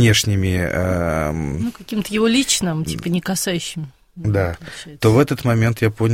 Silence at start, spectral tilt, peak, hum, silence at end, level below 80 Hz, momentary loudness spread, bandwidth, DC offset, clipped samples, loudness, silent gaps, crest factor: 0 s; -5 dB/octave; -2 dBFS; none; 0 s; -38 dBFS; 11 LU; 16.5 kHz; under 0.1%; under 0.1%; -19 LUFS; none; 16 dB